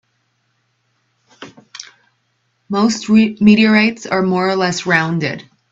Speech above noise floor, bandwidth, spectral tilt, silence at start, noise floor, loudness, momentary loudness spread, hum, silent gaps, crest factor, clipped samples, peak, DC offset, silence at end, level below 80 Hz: 51 dB; 7.8 kHz; -5.5 dB/octave; 1.4 s; -65 dBFS; -14 LUFS; 22 LU; none; none; 16 dB; under 0.1%; 0 dBFS; under 0.1%; 0.3 s; -56 dBFS